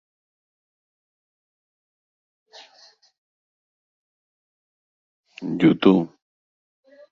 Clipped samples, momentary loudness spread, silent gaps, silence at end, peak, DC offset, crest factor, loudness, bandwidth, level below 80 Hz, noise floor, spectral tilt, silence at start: under 0.1%; 18 LU; none; 1.05 s; -2 dBFS; under 0.1%; 24 dB; -19 LUFS; 7 kHz; -64 dBFS; -55 dBFS; -8 dB/octave; 5.4 s